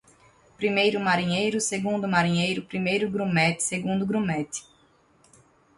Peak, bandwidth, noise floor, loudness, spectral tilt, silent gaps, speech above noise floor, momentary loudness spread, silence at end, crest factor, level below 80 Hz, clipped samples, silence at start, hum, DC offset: -8 dBFS; 11.5 kHz; -61 dBFS; -25 LUFS; -4.5 dB/octave; none; 36 dB; 6 LU; 1.15 s; 18 dB; -62 dBFS; under 0.1%; 0.6 s; none; under 0.1%